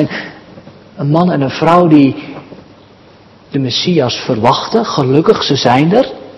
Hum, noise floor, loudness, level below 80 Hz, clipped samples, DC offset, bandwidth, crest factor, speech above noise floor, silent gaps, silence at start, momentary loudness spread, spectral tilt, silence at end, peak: none; -41 dBFS; -11 LUFS; -50 dBFS; 0.8%; under 0.1%; 8.2 kHz; 12 dB; 30 dB; none; 0 s; 14 LU; -6.5 dB/octave; 0 s; 0 dBFS